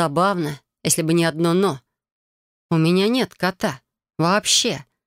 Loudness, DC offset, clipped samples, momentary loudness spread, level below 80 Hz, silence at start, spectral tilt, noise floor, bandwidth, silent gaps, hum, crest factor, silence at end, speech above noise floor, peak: -20 LUFS; under 0.1%; under 0.1%; 11 LU; -60 dBFS; 0 s; -4 dB/octave; under -90 dBFS; 16 kHz; 2.12-2.69 s; none; 16 dB; 0.25 s; over 71 dB; -4 dBFS